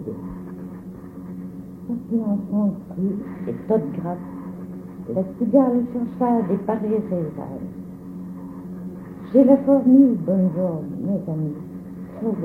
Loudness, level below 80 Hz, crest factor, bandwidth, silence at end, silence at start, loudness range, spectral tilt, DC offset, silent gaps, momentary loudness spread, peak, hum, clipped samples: -21 LUFS; -54 dBFS; 20 dB; 2.9 kHz; 0 s; 0 s; 7 LU; -11.5 dB/octave; under 0.1%; none; 20 LU; -2 dBFS; none; under 0.1%